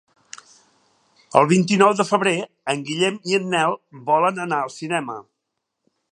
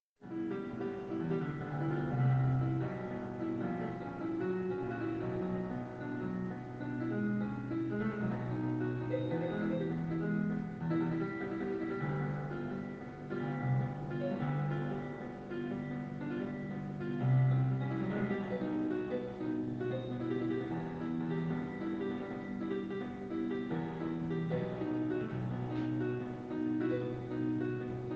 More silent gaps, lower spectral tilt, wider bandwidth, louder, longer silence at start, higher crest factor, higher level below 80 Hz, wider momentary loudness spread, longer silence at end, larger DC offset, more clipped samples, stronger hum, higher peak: neither; second, -5 dB/octave vs -9.5 dB/octave; first, 11 kHz vs 6.4 kHz; first, -20 LUFS vs -37 LUFS; first, 1.35 s vs 0.2 s; first, 20 dB vs 14 dB; second, -70 dBFS vs -62 dBFS; first, 16 LU vs 6 LU; first, 0.9 s vs 0 s; neither; neither; neither; first, 0 dBFS vs -22 dBFS